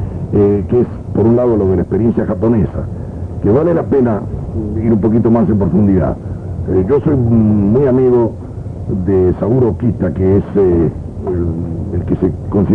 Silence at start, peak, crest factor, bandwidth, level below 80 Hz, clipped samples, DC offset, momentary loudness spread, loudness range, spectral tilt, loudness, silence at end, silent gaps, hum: 0 s; 0 dBFS; 12 dB; 3.8 kHz; -30 dBFS; under 0.1%; under 0.1%; 10 LU; 2 LU; -12 dB/octave; -14 LUFS; 0 s; none; none